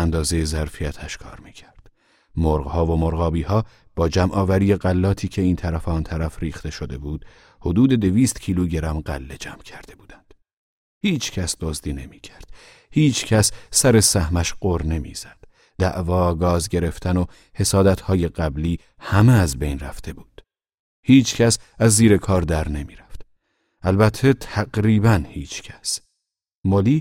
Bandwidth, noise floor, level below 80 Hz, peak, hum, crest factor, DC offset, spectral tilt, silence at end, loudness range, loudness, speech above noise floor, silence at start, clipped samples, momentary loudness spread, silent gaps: 16.5 kHz; -80 dBFS; -34 dBFS; 0 dBFS; none; 20 dB; under 0.1%; -5.5 dB/octave; 0 s; 6 LU; -20 LUFS; 61 dB; 0 s; under 0.1%; 16 LU; 10.53-11.01 s, 20.74-21.03 s, 26.55-26.63 s